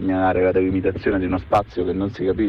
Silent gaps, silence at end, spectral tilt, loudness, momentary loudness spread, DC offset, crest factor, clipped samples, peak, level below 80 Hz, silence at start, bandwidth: none; 0 s; -8.5 dB/octave; -21 LUFS; 5 LU; under 0.1%; 14 dB; under 0.1%; -6 dBFS; -40 dBFS; 0 s; 6.6 kHz